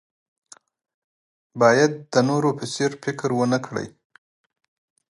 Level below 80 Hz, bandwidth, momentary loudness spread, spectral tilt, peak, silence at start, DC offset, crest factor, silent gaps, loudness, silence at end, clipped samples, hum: -68 dBFS; 11.5 kHz; 15 LU; -5.5 dB/octave; -2 dBFS; 1.55 s; under 0.1%; 22 dB; none; -21 LUFS; 1.25 s; under 0.1%; none